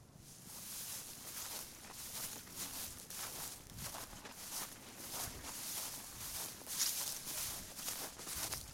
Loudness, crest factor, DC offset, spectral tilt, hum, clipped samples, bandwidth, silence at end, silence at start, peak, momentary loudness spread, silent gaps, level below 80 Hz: -43 LUFS; 24 dB; under 0.1%; -1 dB/octave; none; under 0.1%; 16.5 kHz; 0 s; 0 s; -22 dBFS; 8 LU; none; -64 dBFS